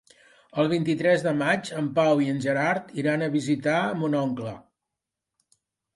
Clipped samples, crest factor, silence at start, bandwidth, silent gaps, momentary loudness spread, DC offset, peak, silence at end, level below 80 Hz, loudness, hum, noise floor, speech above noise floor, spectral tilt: under 0.1%; 16 dB; 0.55 s; 11.5 kHz; none; 7 LU; under 0.1%; -10 dBFS; 1.35 s; -68 dBFS; -25 LUFS; none; -86 dBFS; 62 dB; -6.5 dB/octave